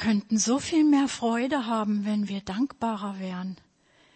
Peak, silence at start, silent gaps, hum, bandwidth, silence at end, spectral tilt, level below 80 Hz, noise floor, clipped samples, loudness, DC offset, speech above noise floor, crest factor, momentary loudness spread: -12 dBFS; 0 s; none; none; 8.8 kHz; 0.6 s; -4.5 dB/octave; -62 dBFS; -62 dBFS; under 0.1%; -26 LUFS; under 0.1%; 36 dB; 14 dB; 12 LU